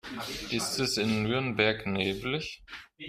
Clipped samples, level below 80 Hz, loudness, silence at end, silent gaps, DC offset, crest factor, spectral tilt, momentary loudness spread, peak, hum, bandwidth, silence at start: under 0.1%; -56 dBFS; -29 LUFS; 0 s; none; under 0.1%; 20 dB; -4 dB/octave; 11 LU; -10 dBFS; none; 15.5 kHz; 0.05 s